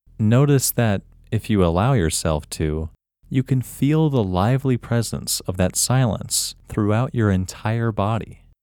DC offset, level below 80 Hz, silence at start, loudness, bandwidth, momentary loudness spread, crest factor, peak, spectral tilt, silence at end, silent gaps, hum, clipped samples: under 0.1%; -40 dBFS; 0.2 s; -21 LUFS; 19 kHz; 8 LU; 16 dB; -4 dBFS; -5.5 dB/octave; 0.3 s; none; none; under 0.1%